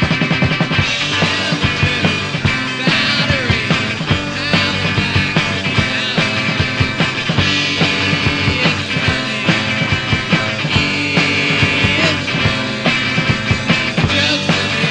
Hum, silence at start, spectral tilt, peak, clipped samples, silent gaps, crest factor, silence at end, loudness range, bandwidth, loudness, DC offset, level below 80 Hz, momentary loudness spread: none; 0 s; -4.5 dB/octave; 0 dBFS; under 0.1%; none; 16 dB; 0 s; 1 LU; 10 kHz; -14 LUFS; under 0.1%; -36 dBFS; 3 LU